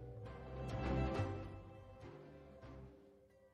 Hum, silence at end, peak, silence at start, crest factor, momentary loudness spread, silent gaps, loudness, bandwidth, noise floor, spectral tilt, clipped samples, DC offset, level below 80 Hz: none; 0.05 s; -28 dBFS; 0 s; 18 dB; 19 LU; none; -45 LUFS; 10 kHz; -66 dBFS; -8 dB/octave; under 0.1%; under 0.1%; -52 dBFS